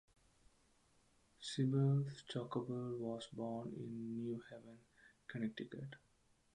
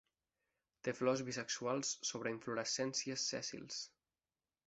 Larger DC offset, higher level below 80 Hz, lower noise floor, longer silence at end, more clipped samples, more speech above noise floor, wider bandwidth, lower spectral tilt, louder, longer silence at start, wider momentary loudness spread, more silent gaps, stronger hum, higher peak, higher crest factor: neither; about the same, -78 dBFS vs -82 dBFS; second, -74 dBFS vs under -90 dBFS; second, 0.55 s vs 0.8 s; neither; second, 32 dB vs over 49 dB; first, 10.5 kHz vs 8.2 kHz; first, -7 dB/octave vs -2.5 dB/octave; second, -43 LUFS vs -40 LUFS; first, 1.4 s vs 0.85 s; first, 19 LU vs 8 LU; neither; neither; second, -26 dBFS vs -20 dBFS; about the same, 18 dB vs 22 dB